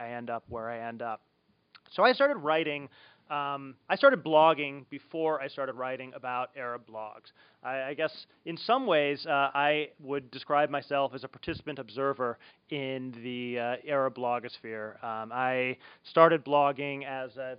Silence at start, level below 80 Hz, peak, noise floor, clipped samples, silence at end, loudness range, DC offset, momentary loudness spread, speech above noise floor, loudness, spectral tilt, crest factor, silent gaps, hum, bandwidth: 0 s; -72 dBFS; -6 dBFS; -62 dBFS; under 0.1%; 0 s; 7 LU; under 0.1%; 16 LU; 32 dB; -30 LUFS; -2.5 dB/octave; 24 dB; none; none; 5.2 kHz